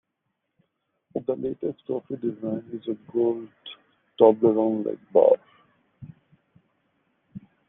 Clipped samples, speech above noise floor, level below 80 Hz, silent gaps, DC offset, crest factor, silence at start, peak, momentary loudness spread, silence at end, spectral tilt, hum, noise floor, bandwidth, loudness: under 0.1%; 56 dB; -72 dBFS; none; under 0.1%; 22 dB; 1.15 s; -4 dBFS; 15 LU; 0.3 s; -7 dB/octave; none; -79 dBFS; 3.9 kHz; -24 LUFS